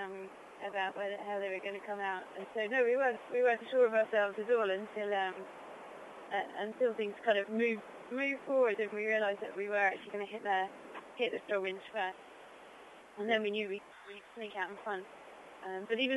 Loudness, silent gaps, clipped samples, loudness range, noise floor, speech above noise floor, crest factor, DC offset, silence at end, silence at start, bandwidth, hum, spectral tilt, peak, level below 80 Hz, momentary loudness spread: -35 LUFS; none; under 0.1%; 7 LU; -55 dBFS; 20 dB; 18 dB; under 0.1%; 0 s; 0 s; 11.5 kHz; none; -4.5 dB/octave; -18 dBFS; -84 dBFS; 19 LU